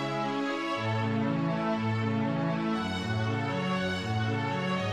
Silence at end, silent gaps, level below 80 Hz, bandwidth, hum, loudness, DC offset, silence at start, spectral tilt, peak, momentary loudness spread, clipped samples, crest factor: 0 s; none; -64 dBFS; 10 kHz; none; -30 LUFS; under 0.1%; 0 s; -6.5 dB/octave; -18 dBFS; 2 LU; under 0.1%; 12 dB